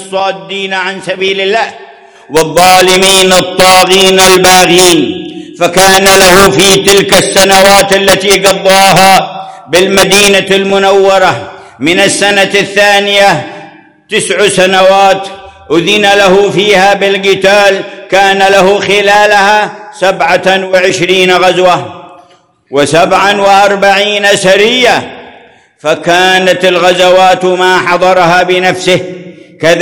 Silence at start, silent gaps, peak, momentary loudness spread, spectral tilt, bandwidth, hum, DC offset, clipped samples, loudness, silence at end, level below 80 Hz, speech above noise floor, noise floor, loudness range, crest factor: 0 s; none; 0 dBFS; 10 LU; -2.5 dB/octave; over 20 kHz; none; under 0.1%; 10%; -6 LUFS; 0 s; -38 dBFS; 38 dB; -44 dBFS; 4 LU; 6 dB